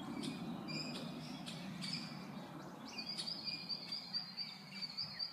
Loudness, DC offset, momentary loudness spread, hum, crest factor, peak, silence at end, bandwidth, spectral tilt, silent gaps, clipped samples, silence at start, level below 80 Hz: -44 LUFS; under 0.1%; 7 LU; none; 16 dB; -30 dBFS; 0 s; 15.5 kHz; -4 dB/octave; none; under 0.1%; 0 s; -78 dBFS